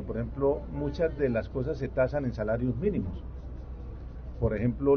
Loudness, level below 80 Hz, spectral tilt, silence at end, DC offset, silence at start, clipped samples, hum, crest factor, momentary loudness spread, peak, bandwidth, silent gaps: -30 LUFS; -40 dBFS; -8.5 dB/octave; 0 s; under 0.1%; 0 s; under 0.1%; none; 16 dB; 14 LU; -14 dBFS; 6.6 kHz; none